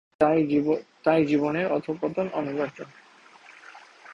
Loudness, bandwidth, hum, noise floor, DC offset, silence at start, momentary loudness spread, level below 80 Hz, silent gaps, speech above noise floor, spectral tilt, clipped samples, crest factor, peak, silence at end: -25 LUFS; 7.4 kHz; none; -52 dBFS; under 0.1%; 0.2 s; 21 LU; -64 dBFS; none; 28 dB; -8 dB/octave; under 0.1%; 20 dB; -6 dBFS; 0 s